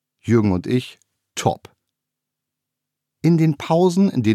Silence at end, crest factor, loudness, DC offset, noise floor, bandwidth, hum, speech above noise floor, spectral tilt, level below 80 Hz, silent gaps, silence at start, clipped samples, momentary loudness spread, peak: 0 s; 16 dB; -19 LUFS; under 0.1%; -83 dBFS; 14 kHz; none; 65 dB; -7 dB/octave; -56 dBFS; none; 0.25 s; under 0.1%; 11 LU; -4 dBFS